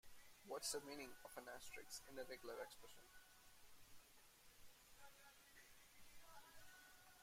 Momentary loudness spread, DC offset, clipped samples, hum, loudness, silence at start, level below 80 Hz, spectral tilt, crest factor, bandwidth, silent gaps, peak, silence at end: 18 LU; under 0.1%; under 0.1%; none; -56 LUFS; 0.05 s; -78 dBFS; -1.5 dB/octave; 24 dB; 16 kHz; none; -34 dBFS; 0 s